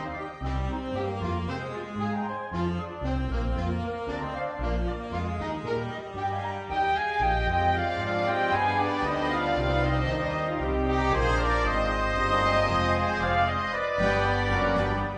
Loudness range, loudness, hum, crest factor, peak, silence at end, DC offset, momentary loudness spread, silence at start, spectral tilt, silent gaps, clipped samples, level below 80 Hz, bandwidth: 6 LU; -27 LUFS; none; 16 dB; -12 dBFS; 0 s; under 0.1%; 8 LU; 0 s; -6.5 dB/octave; none; under 0.1%; -36 dBFS; 9.8 kHz